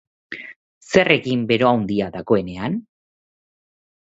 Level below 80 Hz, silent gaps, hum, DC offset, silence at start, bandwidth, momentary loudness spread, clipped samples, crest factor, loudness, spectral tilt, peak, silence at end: -52 dBFS; 0.56-0.81 s; none; under 0.1%; 0.3 s; 8 kHz; 18 LU; under 0.1%; 22 dB; -19 LUFS; -6 dB/octave; 0 dBFS; 1.25 s